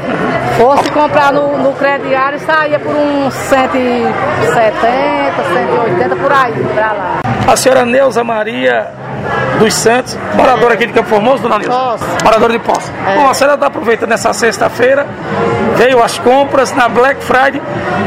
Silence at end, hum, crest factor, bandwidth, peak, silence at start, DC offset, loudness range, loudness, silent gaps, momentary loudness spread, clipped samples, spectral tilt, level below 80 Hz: 0 s; none; 10 dB; 16.5 kHz; 0 dBFS; 0 s; under 0.1%; 1 LU; -10 LUFS; none; 6 LU; 0.5%; -4.5 dB/octave; -42 dBFS